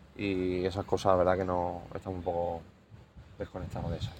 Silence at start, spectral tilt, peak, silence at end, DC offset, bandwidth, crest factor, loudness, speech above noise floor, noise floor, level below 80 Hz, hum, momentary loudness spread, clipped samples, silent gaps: 0 s; -7 dB/octave; -10 dBFS; 0 s; under 0.1%; 16 kHz; 24 dB; -32 LUFS; 22 dB; -53 dBFS; -52 dBFS; none; 14 LU; under 0.1%; none